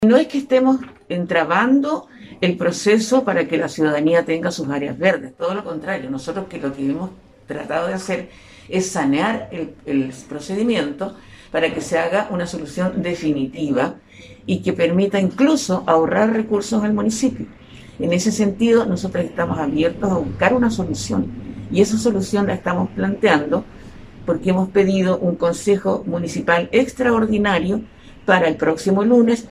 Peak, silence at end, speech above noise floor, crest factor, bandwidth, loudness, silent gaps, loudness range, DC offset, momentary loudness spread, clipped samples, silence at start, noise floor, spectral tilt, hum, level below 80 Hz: 0 dBFS; 0 s; 19 dB; 18 dB; 13.5 kHz; -19 LUFS; none; 5 LU; under 0.1%; 10 LU; under 0.1%; 0 s; -38 dBFS; -5.5 dB/octave; none; -48 dBFS